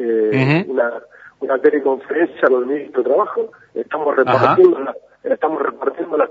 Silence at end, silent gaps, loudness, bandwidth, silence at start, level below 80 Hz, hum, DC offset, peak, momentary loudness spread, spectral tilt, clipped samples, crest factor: 0 s; none; -17 LUFS; 7.2 kHz; 0 s; -64 dBFS; none; under 0.1%; 0 dBFS; 12 LU; -8.5 dB/octave; under 0.1%; 16 dB